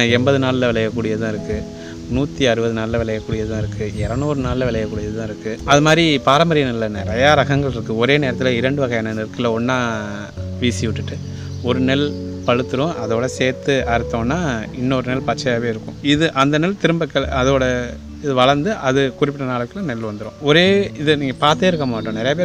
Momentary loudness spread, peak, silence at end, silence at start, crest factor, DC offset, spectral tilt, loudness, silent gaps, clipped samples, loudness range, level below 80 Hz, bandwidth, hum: 11 LU; 0 dBFS; 0 s; 0 s; 18 dB; under 0.1%; -5.5 dB/octave; -18 LUFS; none; under 0.1%; 5 LU; -38 dBFS; 12 kHz; none